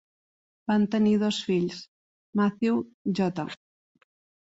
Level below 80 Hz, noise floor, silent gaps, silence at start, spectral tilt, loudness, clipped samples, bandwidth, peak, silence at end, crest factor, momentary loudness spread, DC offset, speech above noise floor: -66 dBFS; under -90 dBFS; 1.88-2.33 s, 2.94-3.05 s; 0.7 s; -6.5 dB/octave; -27 LUFS; under 0.1%; 8 kHz; -12 dBFS; 0.95 s; 16 dB; 14 LU; under 0.1%; over 65 dB